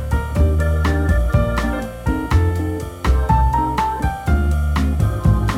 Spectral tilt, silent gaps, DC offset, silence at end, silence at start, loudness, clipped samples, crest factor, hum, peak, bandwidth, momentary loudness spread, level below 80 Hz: -7.5 dB/octave; none; under 0.1%; 0 s; 0 s; -19 LUFS; under 0.1%; 14 dB; none; -4 dBFS; 14.5 kHz; 6 LU; -20 dBFS